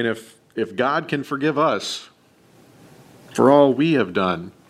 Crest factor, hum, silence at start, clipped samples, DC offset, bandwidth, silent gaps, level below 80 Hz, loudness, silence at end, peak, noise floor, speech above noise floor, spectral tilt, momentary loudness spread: 20 dB; none; 0 s; under 0.1%; under 0.1%; 14 kHz; none; -64 dBFS; -20 LUFS; 0.2 s; 0 dBFS; -54 dBFS; 34 dB; -5.5 dB/octave; 16 LU